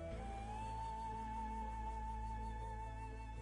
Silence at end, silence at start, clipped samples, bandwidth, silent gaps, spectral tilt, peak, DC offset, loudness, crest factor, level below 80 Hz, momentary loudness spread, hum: 0 s; 0 s; under 0.1%; 11 kHz; none; -6.5 dB/octave; -36 dBFS; under 0.1%; -47 LUFS; 10 dB; -48 dBFS; 3 LU; none